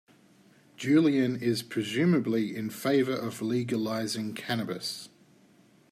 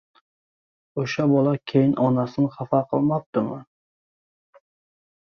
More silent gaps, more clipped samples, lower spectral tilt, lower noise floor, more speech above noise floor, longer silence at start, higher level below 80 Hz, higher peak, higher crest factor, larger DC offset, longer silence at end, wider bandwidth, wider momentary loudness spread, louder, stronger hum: second, none vs 3.26-3.33 s; neither; second, -5.5 dB/octave vs -8 dB/octave; second, -60 dBFS vs under -90 dBFS; second, 33 dB vs over 69 dB; second, 0.8 s vs 0.95 s; second, -74 dBFS vs -64 dBFS; second, -12 dBFS vs -6 dBFS; about the same, 16 dB vs 20 dB; neither; second, 0.85 s vs 1.65 s; first, 15 kHz vs 6.6 kHz; about the same, 10 LU vs 10 LU; second, -29 LUFS vs -22 LUFS; neither